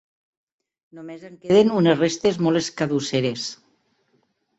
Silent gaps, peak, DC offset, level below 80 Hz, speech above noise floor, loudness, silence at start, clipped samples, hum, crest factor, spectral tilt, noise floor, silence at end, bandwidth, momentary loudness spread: none; -4 dBFS; under 0.1%; -62 dBFS; 47 dB; -20 LUFS; 0.95 s; under 0.1%; none; 18 dB; -5.5 dB/octave; -67 dBFS; 1.05 s; 8.2 kHz; 21 LU